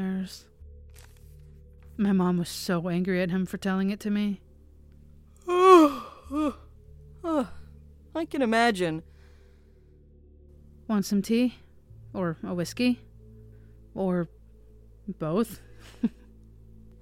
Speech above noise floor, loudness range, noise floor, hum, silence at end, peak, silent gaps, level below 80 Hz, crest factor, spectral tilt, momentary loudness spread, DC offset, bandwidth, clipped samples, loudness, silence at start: 28 dB; 8 LU; -55 dBFS; none; 0.9 s; -4 dBFS; none; -52 dBFS; 24 dB; -6 dB/octave; 17 LU; under 0.1%; 16 kHz; under 0.1%; -26 LUFS; 0 s